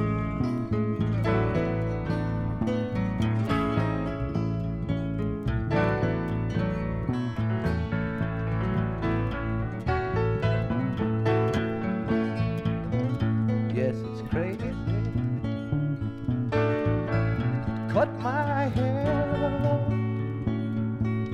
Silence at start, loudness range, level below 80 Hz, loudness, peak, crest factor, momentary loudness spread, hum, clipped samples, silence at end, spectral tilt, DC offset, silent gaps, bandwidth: 0 s; 2 LU; -40 dBFS; -28 LUFS; -10 dBFS; 16 dB; 4 LU; none; under 0.1%; 0 s; -9 dB/octave; under 0.1%; none; 6.8 kHz